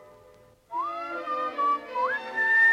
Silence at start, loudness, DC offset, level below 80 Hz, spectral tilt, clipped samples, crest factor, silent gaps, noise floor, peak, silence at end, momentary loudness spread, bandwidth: 0 s; -27 LUFS; under 0.1%; -72 dBFS; -3 dB/octave; under 0.1%; 14 dB; none; -55 dBFS; -14 dBFS; 0 s; 11 LU; 11 kHz